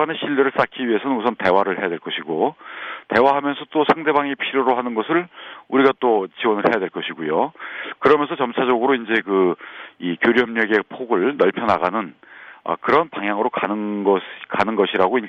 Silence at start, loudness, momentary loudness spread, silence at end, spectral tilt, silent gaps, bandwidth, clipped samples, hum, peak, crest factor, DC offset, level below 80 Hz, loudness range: 0 s; -20 LUFS; 10 LU; 0 s; -7 dB/octave; none; 6.6 kHz; under 0.1%; none; -2 dBFS; 18 dB; under 0.1%; -60 dBFS; 2 LU